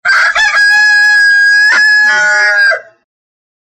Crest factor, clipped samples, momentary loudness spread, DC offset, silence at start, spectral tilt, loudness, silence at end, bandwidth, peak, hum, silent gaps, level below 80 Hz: 6 dB; under 0.1%; 3 LU; under 0.1%; 0.05 s; 2 dB/octave; -6 LUFS; 0.9 s; 12 kHz; -2 dBFS; none; none; -54 dBFS